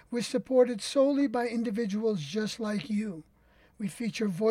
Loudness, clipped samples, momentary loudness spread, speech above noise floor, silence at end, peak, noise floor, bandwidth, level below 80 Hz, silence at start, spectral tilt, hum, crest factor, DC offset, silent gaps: -30 LUFS; under 0.1%; 10 LU; 33 dB; 0 s; -14 dBFS; -62 dBFS; 15 kHz; -68 dBFS; 0.1 s; -5.5 dB/octave; none; 16 dB; under 0.1%; none